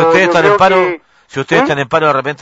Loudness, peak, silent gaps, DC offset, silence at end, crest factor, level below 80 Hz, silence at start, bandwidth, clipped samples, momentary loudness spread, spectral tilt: -11 LUFS; 0 dBFS; none; under 0.1%; 0.05 s; 12 dB; -48 dBFS; 0 s; 8.2 kHz; 0.3%; 14 LU; -5.5 dB/octave